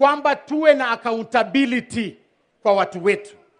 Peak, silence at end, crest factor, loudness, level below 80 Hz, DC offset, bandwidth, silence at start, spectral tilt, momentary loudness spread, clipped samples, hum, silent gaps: -2 dBFS; 0.3 s; 18 dB; -20 LUFS; -62 dBFS; under 0.1%; 10.5 kHz; 0 s; -5 dB/octave; 9 LU; under 0.1%; none; none